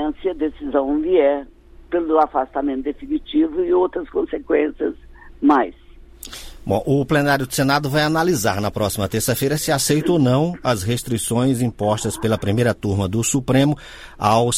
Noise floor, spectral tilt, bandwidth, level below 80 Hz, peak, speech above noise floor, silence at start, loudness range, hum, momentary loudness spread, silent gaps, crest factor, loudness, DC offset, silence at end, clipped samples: -40 dBFS; -5 dB/octave; 16 kHz; -42 dBFS; -2 dBFS; 21 dB; 0 s; 2 LU; none; 9 LU; none; 18 dB; -19 LUFS; under 0.1%; 0 s; under 0.1%